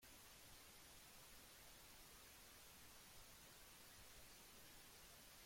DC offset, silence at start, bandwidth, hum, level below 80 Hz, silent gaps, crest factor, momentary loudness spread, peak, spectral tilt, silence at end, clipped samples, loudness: under 0.1%; 0 s; 16.5 kHz; none; -74 dBFS; none; 14 dB; 0 LU; -50 dBFS; -1.5 dB/octave; 0 s; under 0.1%; -62 LUFS